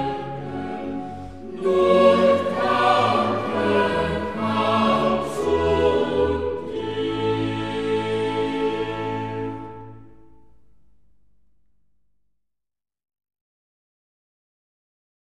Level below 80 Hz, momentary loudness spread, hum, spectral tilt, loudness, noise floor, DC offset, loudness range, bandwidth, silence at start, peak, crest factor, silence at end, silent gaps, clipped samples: -46 dBFS; 13 LU; none; -6.5 dB/octave; -22 LUFS; -87 dBFS; 0.5%; 11 LU; 12.5 kHz; 0 s; -4 dBFS; 20 dB; 5.2 s; none; under 0.1%